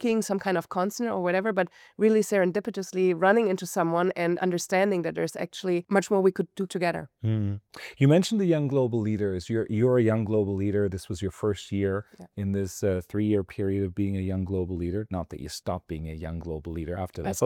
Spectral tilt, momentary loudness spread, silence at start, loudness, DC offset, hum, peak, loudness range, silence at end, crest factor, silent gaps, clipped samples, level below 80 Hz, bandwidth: -6.5 dB/octave; 12 LU; 0 s; -27 LUFS; under 0.1%; none; -10 dBFS; 5 LU; 0 s; 16 dB; none; under 0.1%; -56 dBFS; 17 kHz